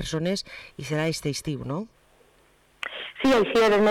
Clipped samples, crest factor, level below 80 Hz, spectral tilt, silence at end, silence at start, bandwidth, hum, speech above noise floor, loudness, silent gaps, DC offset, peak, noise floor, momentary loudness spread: under 0.1%; 10 dB; -52 dBFS; -5 dB/octave; 0 s; 0 s; 17 kHz; none; 36 dB; -25 LUFS; none; under 0.1%; -16 dBFS; -60 dBFS; 17 LU